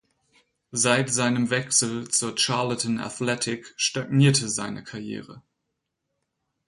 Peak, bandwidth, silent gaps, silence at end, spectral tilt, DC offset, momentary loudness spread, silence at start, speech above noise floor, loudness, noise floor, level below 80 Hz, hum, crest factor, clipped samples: -6 dBFS; 11.5 kHz; none; 1.3 s; -3.5 dB/octave; under 0.1%; 14 LU; 0.75 s; 56 dB; -23 LUFS; -80 dBFS; -64 dBFS; none; 20 dB; under 0.1%